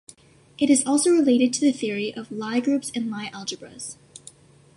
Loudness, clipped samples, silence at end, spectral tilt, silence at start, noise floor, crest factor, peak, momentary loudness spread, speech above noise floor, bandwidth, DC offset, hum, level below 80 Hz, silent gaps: -22 LUFS; under 0.1%; 0.85 s; -3.5 dB/octave; 0.6 s; -51 dBFS; 16 dB; -8 dBFS; 18 LU; 29 dB; 11.5 kHz; under 0.1%; none; -68 dBFS; none